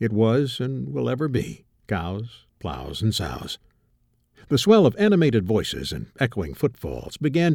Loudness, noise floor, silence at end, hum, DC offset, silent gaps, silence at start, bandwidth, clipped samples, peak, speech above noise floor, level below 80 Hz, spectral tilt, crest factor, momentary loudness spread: -23 LUFS; -65 dBFS; 0 s; none; under 0.1%; none; 0 s; 17.5 kHz; under 0.1%; -4 dBFS; 43 dB; -46 dBFS; -6.5 dB/octave; 18 dB; 16 LU